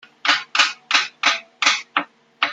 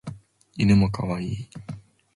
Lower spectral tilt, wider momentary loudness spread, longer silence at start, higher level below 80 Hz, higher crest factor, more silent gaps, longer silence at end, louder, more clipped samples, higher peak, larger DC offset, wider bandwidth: second, 1.5 dB/octave vs -7.5 dB/octave; second, 8 LU vs 22 LU; first, 0.25 s vs 0.05 s; second, -78 dBFS vs -44 dBFS; about the same, 20 dB vs 18 dB; neither; second, 0 s vs 0.35 s; first, -19 LUFS vs -23 LUFS; neither; first, -2 dBFS vs -8 dBFS; neither; first, 14 kHz vs 11.5 kHz